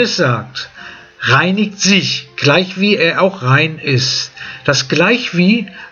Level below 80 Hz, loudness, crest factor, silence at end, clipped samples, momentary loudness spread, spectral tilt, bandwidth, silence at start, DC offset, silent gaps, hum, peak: -54 dBFS; -13 LUFS; 14 dB; 0 s; under 0.1%; 11 LU; -4.5 dB/octave; 7.4 kHz; 0 s; under 0.1%; none; none; 0 dBFS